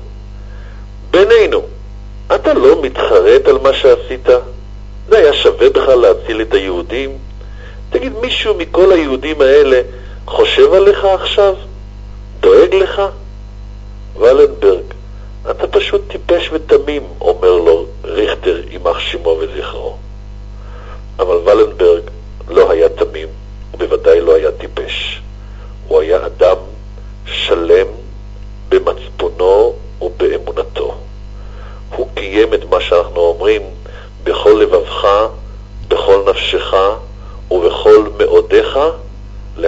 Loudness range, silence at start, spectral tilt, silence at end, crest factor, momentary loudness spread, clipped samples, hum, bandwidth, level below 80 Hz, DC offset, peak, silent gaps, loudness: 5 LU; 0 s; -5.5 dB/octave; 0 s; 12 dB; 24 LU; 0.2%; 50 Hz at -30 dBFS; 7.8 kHz; -28 dBFS; under 0.1%; 0 dBFS; none; -12 LUFS